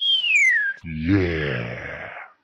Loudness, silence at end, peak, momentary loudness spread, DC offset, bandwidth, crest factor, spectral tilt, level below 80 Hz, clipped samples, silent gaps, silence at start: -19 LUFS; 0.15 s; -6 dBFS; 18 LU; under 0.1%; 11.5 kHz; 16 dB; -4 dB/octave; -44 dBFS; under 0.1%; none; 0 s